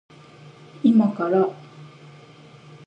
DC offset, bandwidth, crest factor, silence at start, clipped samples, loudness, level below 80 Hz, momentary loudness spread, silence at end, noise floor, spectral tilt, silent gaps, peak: under 0.1%; 5.8 kHz; 18 dB; 0.85 s; under 0.1%; -20 LUFS; -74 dBFS; 8 LU; 1 s; -47 dBFS; -9 dB/octave; none; -6 dBFS